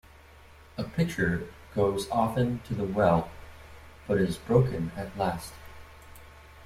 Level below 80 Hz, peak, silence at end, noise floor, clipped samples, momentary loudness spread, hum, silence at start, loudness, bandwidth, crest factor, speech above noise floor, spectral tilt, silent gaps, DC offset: -50 dBFS; -8 dBFS; 0 s; -52 dBFS; under 0.1%; 24 LU; none; 0.75 s; -28 LUFS; 15.5 kHz; 20 dB; 25 dB; -7 dB/octave; none; under 0.1%